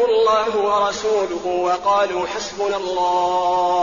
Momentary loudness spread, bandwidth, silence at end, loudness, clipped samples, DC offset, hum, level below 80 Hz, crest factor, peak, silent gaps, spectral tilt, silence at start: 6 LU; 7.4 kHz; 0 s; -19 LUFS; under 0.1%; 0.2%; none; -54 dBFS; 12 dB; -8 dBFS; none; -1.5 dB/octave; 0 s